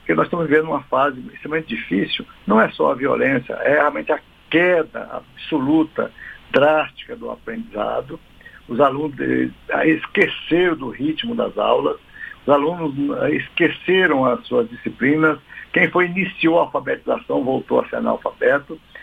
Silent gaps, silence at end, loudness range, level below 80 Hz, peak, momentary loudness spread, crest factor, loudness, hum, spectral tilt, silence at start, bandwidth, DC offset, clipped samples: none; 0 s; 3 LU; -52 dBFS; 0 dBFS; 12 LU; 20 dB; -19 LUFS; none; -7.5 dB/octave; 0.05 s; 5 kHz; under 0.1%; under 0.1%